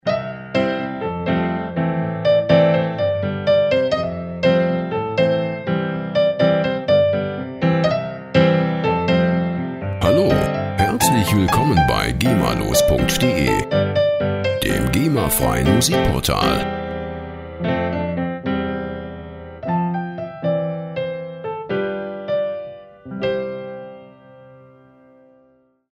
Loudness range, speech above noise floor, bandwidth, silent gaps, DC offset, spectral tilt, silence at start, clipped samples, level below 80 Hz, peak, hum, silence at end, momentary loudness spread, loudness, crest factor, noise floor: 8 LU; 40 dB; 16 kHz; none; under 0.1%; -5.5 dB/octave; 0.05 s; under 0.1%; -36 dBFS; 0 dBFS; none; 1.35 s; 12 LU; -19 LUFS; 18 dB; -57 dBFS